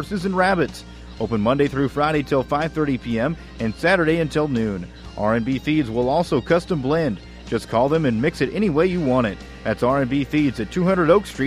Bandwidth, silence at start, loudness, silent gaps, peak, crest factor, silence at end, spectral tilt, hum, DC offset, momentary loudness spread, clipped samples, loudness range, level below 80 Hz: 14.5 kHz; 0 s; -21 LUFS; none; -4 dBFS; 16 dB; 0 s; -7 dB/octave; none; under 0.1%; 9 LU; under 0.1%; 1 LU; -42 dBFS